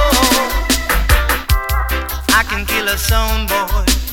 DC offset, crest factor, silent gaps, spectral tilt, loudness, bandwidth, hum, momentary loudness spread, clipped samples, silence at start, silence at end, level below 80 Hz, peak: under 0.1%; 14 dB; none; -3 dB/octave; -15 LUFS; 18.5 kHz; none; 5 LU; under 0.1%; 0 s; 0 s; -18 dBFS; 0 dBFS